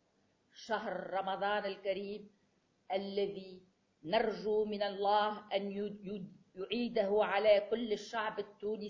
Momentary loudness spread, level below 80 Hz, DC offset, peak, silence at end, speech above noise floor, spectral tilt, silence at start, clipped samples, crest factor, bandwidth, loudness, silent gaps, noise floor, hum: 15 LU; -74 dBFS; under 0.1%; -16 dBFS; 0 s; 39 dB; -2.5 dB/octave; 0.55 s; under 0.1%; 20 dB; 7.2 kHz; -35 LUFS; none; -75 dBFS; none